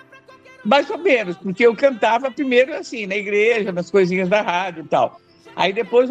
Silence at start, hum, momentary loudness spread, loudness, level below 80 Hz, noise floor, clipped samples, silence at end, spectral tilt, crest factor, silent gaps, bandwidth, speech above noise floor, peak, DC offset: 0.15 s; none; 7 LU; -18 LUFS; -66 dBFS; -46 dBFS; under 0.1%; 0 s; -5.5 dB/octave; 18 dB; none; 8.6 kHz; 28 dB; -2 dBFS; under 0.1%